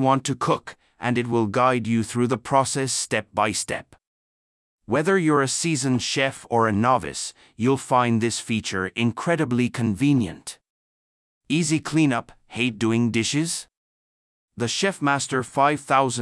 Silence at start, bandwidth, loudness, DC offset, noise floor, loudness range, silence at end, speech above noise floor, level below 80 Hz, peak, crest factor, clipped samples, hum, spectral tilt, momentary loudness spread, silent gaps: 0 s; 12 kHz; -23 LUFS; under 0.1%; under -90 dBFS; 2 LU; 0 s; over 68 dB; -60 dBFS; -6 dBFS; 18 dB; under 0.1%; none; -4.5 dB/octave; 8 LU; 4.07-4.78 s, 10.70-11.41 s, 13.77-14.48 s